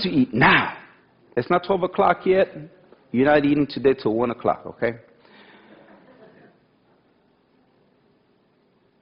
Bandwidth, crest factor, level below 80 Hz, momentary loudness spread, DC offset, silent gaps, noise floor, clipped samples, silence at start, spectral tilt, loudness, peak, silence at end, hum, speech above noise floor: 5.4 kHz; 18 dB; -54 dBFS; 13 LU; under 0.1%; none; -62 dBFS; under 0.1%; 0 s; -9 dB/octave; -21 LUFS; -6 dBFS; 4.05 s; none; 42 dB